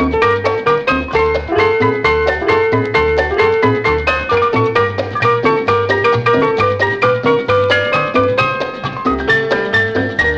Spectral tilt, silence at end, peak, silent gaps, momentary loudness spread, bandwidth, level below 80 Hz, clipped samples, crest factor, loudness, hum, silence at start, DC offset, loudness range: -6.5 dB/octave; 0 s; 0 dBFS; none; 2 LU; 8 kHz; -34 dBFS; under 0.1%; 14 dB; -14 LUFS; none; 0 s; under 0.1%; 1 LU